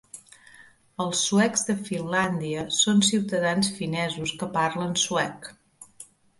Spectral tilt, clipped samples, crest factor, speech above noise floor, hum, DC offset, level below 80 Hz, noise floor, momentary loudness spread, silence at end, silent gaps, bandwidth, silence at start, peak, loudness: -3.5 dB/octave; under 0.1%; 18 dB; 28 dB; none; under 0.1%; -62 dBFS; -53 dBFS; 22 LU; 0.35 s; none; 11.5 kHz; 0.15 s; -8 dBFS; -24 LUFS